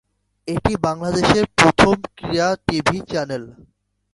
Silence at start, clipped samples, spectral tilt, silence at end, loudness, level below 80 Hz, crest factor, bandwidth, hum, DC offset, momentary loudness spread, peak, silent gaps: 0.45 s; under 0.1%; -5 dB/octave; 0.6 s; -18 LUFS; -40 dBFS; 20 dB; 11.5 kHz; none; under 0.1%; 13 LU; 0 dBFS; none